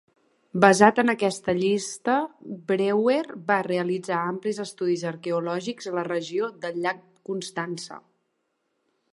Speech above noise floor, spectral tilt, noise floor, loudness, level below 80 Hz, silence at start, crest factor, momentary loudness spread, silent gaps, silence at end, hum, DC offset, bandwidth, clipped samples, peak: 51 dB; -5 dB/octave; -75 dBFS; -25 LUFS; -70 dBFS; 0.55 s; 24 dB; 14 LU; none; 1.15 s; none; under 0.1%; 11.5 kHz; under 0.1%; 0 dBFS